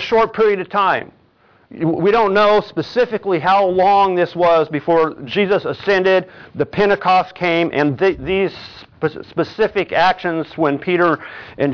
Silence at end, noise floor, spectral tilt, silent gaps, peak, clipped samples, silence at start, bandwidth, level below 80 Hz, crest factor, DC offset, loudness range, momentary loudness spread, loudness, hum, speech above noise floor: 0 s; -53 dBFS; -7 dB/octave; none; -2 dBFS; under 0.1%; 0 s; 5.4 kHz; -50 dBFS; 14 dB; under 0.1%; 3 LU; 9 LU; -16 LUFS; none; 37 dB